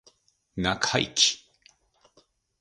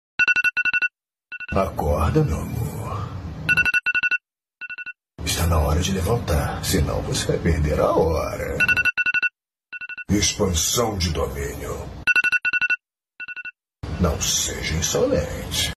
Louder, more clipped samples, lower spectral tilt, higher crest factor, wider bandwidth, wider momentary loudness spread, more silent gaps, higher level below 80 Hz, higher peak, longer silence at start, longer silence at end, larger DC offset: second, -24 LUFS vs -21 LUFS; neither; second, -2 dB/octave vs -3.5 dB/octave; first, 24 dB vs 16 dB; second, 11.5 kHz vs 14.5 kHz; about the same, 17 LU vs 15 LU; neither; second, -54 dBFS vs -32 dBFS; about the same, -6 dBFS vs -6 dBFS; first, 0.55 s vs 0.2 s; first, 1.25 s vs 0 s; neither